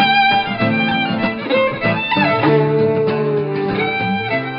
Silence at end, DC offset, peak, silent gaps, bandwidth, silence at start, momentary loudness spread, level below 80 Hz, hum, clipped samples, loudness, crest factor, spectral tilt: 0 s; under 0.1%; -2 dBFS; none; 5.6 kHz; 0 s; 5 LU; -50 dBFS; none; under 0.1%; -16 LUFS; 14 dB; -10.5 dB/octave